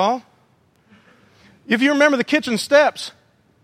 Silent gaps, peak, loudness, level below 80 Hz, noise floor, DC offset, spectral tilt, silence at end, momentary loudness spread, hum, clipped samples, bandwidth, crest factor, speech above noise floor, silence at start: none; 0 dBFS; -17 LUFS; -68 dBFS; -58 dBFS; under 0.1%; -3.5 dB/octave; 0.55 s; 14 LU; none; under 0.1%; 15 kHz; 20 dB; 41 dB; 0 s